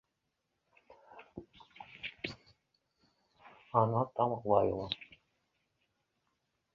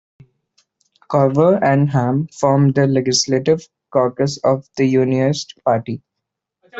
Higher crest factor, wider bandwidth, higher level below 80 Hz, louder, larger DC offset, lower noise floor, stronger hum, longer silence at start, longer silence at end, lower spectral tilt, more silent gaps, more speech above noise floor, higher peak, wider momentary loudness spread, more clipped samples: first, 26 dB vs 14 dB; second, 7.2 kHz vs 8 kHz; second, -66 dBFS vs -56 dBFS; second, -34 LUFS vs -17 LUFS; neither; first, -84 dBFS vs -80 dBFS; neither; about the same, 1.15 s vs 1.1 s; first, 1.7 s vs 0 s; about the same, -5 dB/octave vs -6 dB/octave; neither; second, 53 dB vs 64 dB; second, -12 dBFS vs -2 dBFS; first, 24 LU vs 7 LU; neither